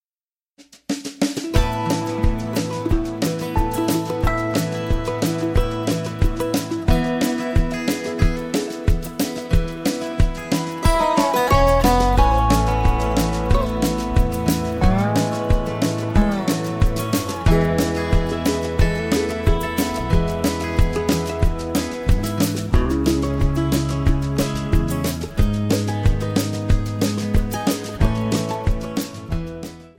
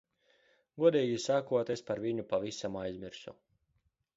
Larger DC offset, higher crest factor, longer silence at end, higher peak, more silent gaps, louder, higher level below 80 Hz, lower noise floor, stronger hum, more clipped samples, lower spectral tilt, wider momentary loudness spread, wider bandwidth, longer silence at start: neither; about the same, 18 dB vs 22 dB; second, 0.1 s vs 0.85 s; first, -2 dBFS vs -12 dBFS; neither; first, -21 LUFS vs -33 LUFS; first, -24 dBFS vs -70 dBFS; first, under -90 dBFS vs -78 dBFS; neither; neither; about the same, -6 dB/octave vs -5.5 dB/octave; second, 6 LU vs 17 LU; first, 17 kHz vs 8 kHz; second, 0.6 s vs 0.75 s